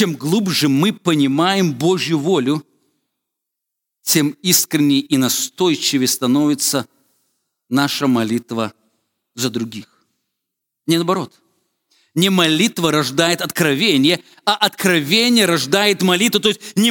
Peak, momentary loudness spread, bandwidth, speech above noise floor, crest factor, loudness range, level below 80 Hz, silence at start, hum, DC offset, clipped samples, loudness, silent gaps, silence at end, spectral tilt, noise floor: 0 dBFS; 9 LU; 19 kHz; 64 dB; 18 dB; 8 LU; -66 dBFS; 0 s; none; under 0.1%; under 0.1%; -16 LUFS; none; 0 s; -3.5 dB/octave; -80 dBFS